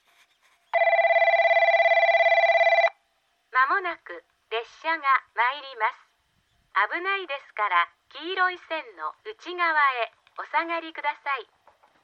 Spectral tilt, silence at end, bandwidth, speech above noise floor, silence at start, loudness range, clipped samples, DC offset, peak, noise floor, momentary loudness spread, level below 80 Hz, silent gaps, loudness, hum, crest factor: -1.5 dB/octave; 0.6 s; 6.4 kHz; 42 dB; 0.75 s; 7 LU; under 0.1%; under 0.1%; -8 dBFS; -70 dBFS; 15 LU; -82 dBFS; none; -23 LUFS; none; 18 dB